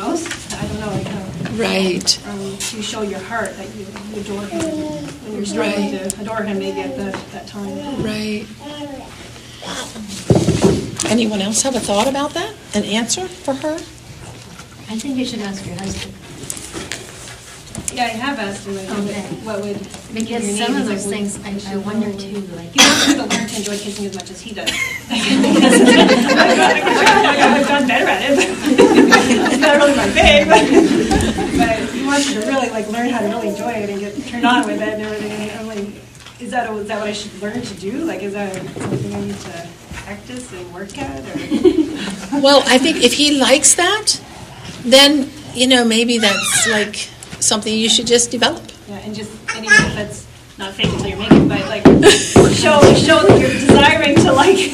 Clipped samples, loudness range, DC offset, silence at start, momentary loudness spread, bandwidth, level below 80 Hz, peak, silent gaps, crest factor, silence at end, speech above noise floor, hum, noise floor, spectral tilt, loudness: 0.1%; 14 LU; under 0.1%; 0 s; 19 LU; 14.5 kHz; -38 dBFS; 0 dBFS; none; 16 dB; 0 s; 22 dB; none; -37 dBFS; -3.5 dB/octave; -14 LUFS